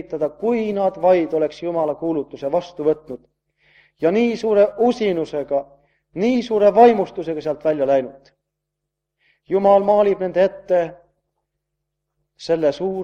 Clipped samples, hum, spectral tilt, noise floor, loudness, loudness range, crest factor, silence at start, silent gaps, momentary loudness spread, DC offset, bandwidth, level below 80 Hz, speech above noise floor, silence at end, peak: under 0.1%; none; -7 dB/octave; -80 dBFS; -19 LUFS; 4 LU; 20 dB; 0.1 s; none; 11 LU; under 0.1%; 8.6 kHz; -60 dBFS; 62 dB; 0 s; 0 dBFS